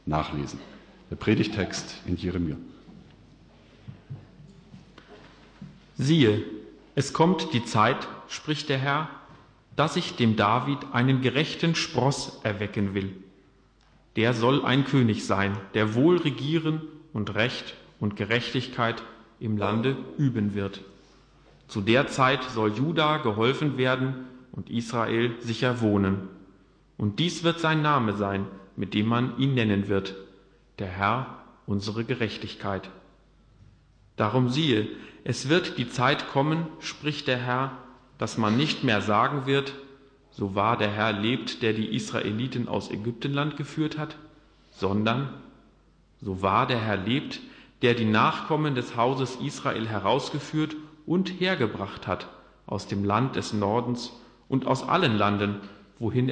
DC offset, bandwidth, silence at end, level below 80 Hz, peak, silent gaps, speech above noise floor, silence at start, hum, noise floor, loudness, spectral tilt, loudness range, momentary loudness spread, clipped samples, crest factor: under 0.1%; 10 kHz; 0 s; -58 dBFS; -8 dBFS; none; 34 dB; 0.05 s; none; -60 dBFS; -26 LUFS; -6 dB/octave; 5 LU; 13 LU; under 0.1%; 18 dB